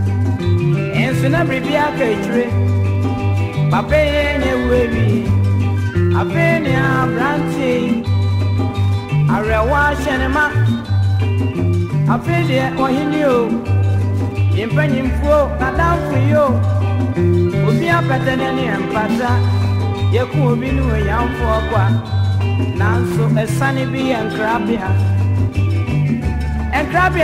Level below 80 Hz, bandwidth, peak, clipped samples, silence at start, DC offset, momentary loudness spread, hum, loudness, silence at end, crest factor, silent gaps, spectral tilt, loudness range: -28 dBFS; 12.5 kHz; -2 dBFS; under 0.1%; 0 s; under 0.1%; 3 LU; none; -16 LUFS; 0 s; 12 dB; none; -7.5 dB/octave; 1 LU